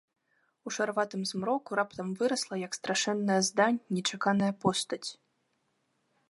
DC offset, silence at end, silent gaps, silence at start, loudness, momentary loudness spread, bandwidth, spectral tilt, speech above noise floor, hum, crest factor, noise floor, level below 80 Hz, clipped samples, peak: under 0.1%; 1.15 s; none; 0.65 s; -30 LUFS; 8 LU; 11.5 kHz; -4 dB/octave; 46 dB; none; 20 dB; -76 dBFS; -74 dBFS; under 0.1%; -12 dBFS